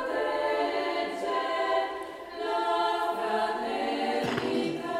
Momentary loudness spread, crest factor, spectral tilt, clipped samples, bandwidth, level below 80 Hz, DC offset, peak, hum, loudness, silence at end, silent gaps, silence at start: 4 LU; 14 dB; -4.5 dB/octave; under 0.1%; 16 kHz; -66 dBFS; under 0.1%; -16 dBFS; none; -29 LUFS; 0 s; none; 0 s